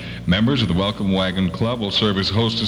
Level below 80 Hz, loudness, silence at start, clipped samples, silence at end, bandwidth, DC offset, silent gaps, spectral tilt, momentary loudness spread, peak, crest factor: -40 dBFS; -19 LUFS; 0 s; under 0.1%; 0 s; 10.5 kHz; under 0.1%; none; -6.5 dB/octave; 3 LU; -4 dBFS; 14 dB